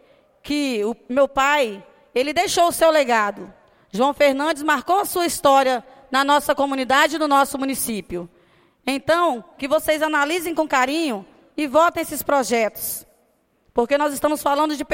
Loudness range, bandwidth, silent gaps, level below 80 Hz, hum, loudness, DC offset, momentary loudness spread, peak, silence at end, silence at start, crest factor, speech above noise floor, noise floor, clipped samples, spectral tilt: 3 LU; 16.5 kHz; none; -54 dBFS; none; -20 LUFS; under 0.1%; 10 LU; -4 dBFS; 0 s; 0.45 s; 18 dB; 43 dB; -63 dBFS; under 0.1%; -2.5 dB/octave